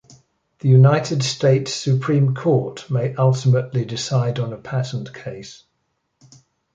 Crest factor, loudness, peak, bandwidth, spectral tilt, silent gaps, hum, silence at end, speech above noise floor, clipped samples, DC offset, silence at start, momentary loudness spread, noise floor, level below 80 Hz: 18 dB; -19 LUFS; -2 dBFS; 7.8 kHz; -6.5 dB/octave; none; none; 1.2 s; 53 dB; under 0.1%; under 0.1%; 0.65 s; 15 LU; -72 dBFS; -58 dBFS